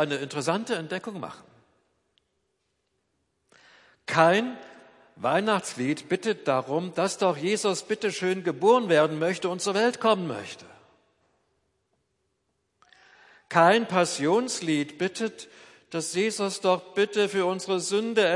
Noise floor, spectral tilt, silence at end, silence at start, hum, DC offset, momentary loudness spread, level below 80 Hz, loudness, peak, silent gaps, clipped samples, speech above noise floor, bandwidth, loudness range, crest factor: -76 dBFS; -4 dB/octave; 0 s; 0 s; none; under 0.1%; 13 LU; -78 dBFS; -25 LUFS; -4 dBFS; none; under 0.1%; 51 dB; 11.5 kHz; 9 LU; 22 dB